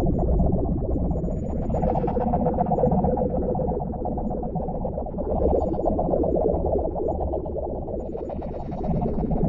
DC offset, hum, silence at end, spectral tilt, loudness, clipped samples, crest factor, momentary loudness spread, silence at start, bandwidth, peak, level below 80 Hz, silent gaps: under 0.1%; none; 0 s; -12 dB/octave; -25 LUFS; under 0.1%; 16 dB; 8 LU; 0 s; 7 kHz; -8 dBFS; -30 dBFS; none